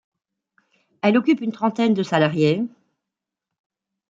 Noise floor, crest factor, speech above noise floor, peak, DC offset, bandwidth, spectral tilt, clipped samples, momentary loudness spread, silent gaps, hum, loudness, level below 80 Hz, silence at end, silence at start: -85 dBFS; 20 dB; 66 dB; -4 dBFS; under 0.1%; 7.6 kHz; -7 dB/octave; under 0.1%; 6 LU; none; none; -20 LUFS; -68 dBFS; 1.45 s; 1.05 s